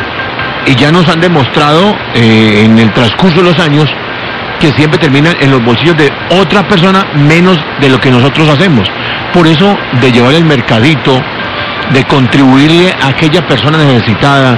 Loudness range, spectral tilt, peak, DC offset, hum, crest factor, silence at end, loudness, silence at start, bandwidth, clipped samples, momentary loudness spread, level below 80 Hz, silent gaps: 1 LU; -6.5 dB/octave; 0 dBFS; 0.9%; none; 6 dB; 0 s; -6 LUFS; 0 s; 11 kHz; 2%; 6 LU; -36 dBFS; none